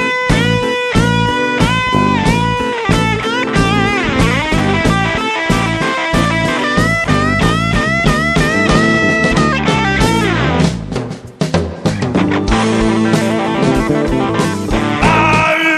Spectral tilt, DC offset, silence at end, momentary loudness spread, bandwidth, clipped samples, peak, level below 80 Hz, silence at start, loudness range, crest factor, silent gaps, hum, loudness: -5.5 dB/octave; under 0.1%; 0 s; 5 LU; 13.5 kHz; under 0.1%; 0 dBFS; -26 dBFS; 0 s; 3 LU; 12 dB; none; none; -13 LUFS